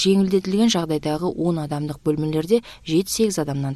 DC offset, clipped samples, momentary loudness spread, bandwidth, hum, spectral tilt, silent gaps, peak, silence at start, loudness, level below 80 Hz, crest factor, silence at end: under 0.1%; under 0.1%; 6 LU; 14 kHz; none; -5.5 dB/octave; none; -6 dBFS; 0 s; -21 LUFS; -50 dBFS; 16 dB; 0 s